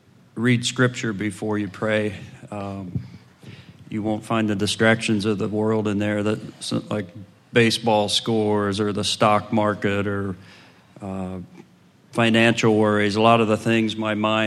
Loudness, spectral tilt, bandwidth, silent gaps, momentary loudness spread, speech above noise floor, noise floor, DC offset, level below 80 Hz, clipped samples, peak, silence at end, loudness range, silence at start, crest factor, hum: -21 LUFS; -5 dB/octave; 12.5 kHz; none; 15 LU; 32 dB; -53 dBFS; under 0.1%; -64 dBFS; under 0.1%; 0 dBFS; 0 s; 6 LU; 0.35 s; 22 dB; none